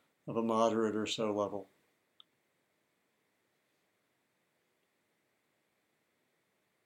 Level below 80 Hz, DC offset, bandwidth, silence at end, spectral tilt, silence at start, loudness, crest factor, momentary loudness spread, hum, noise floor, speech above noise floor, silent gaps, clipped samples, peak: -88 dBFS; under 0.1%; 14.5 kHz; 5.2 s; -5 dB/octave; 0.25 s; -34 LUFS; 24 dB; 9 LU; none; -79 dBFS; 45 dB; none; under 0.1%; -16 dBFS